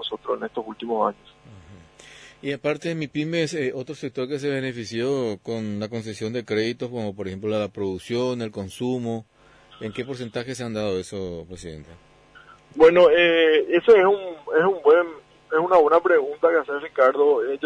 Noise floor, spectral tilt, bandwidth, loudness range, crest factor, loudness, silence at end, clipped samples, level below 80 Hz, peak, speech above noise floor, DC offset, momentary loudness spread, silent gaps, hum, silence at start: -50 dBFS; -5.5 dB/octave; 11 kHz; 12 LU; 18 dB; -22 LUFS; 0 s; under 0.1%; -58 dBFS; -6 dBFS; 28 dB; under 0.1%; 16 LU; none; none; 0 s